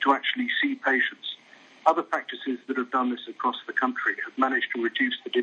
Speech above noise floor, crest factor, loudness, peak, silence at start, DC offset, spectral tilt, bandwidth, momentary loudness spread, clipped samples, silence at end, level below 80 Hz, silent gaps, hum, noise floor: 27 dB; 22 dB; -26 LUFS; -6 dBFS; 0 s; under 0.1%; -3.5 dB/octave; 7.2 kHz; 7 LU; under 0.1%; 0 s; -90 dBFS; none; none; -53 dBFS